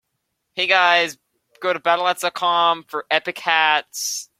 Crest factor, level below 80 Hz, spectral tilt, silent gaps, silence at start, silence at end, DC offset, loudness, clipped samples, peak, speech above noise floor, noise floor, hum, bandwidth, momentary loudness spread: 20 dB; -74 dBFS; -0.5 dB/octave; none; 0.55 s; 0.15 s; under 0.1%; -19 LUFS; under 0.1%; -2 dBFS; 56 dB; -75 dBFS; none; 16.5 kHz; 10 LU